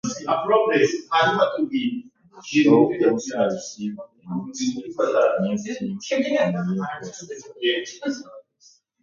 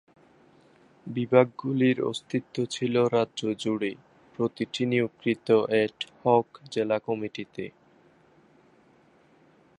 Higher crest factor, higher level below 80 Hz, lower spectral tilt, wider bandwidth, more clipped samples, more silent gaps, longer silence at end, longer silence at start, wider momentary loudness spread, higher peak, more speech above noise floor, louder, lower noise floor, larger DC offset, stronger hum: second, 18 dB vs 24 dB; about the same, -66 dBFS vs -70 dBFS; about the same, -5 dB/octave vs -6 dB/octave; second, 7.6 kHz vs 11 kHz; neither; neither; second, 0.6 s vs 2.1 s; second, 0.05 s vs 1.05 s; about the same, 14 LU vs 14 LU; about the same, -4 dBFS vs -4 dBFS; about the same, 35 dB vs 34 dB; first, -22 LUFS vs -27 LUFS; about the same, -57 dBFS vs -60 dBFS; neither; neither